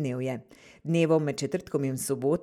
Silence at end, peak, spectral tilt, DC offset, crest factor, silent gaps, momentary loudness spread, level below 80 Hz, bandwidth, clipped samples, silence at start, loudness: 0 s; -12 dBFS; -6 dB/octave; under 0.1%; 16 dB; none; 11 LU; -64 dBFS; 15 kHz; under 0.1%; 0 s; -28 LUFS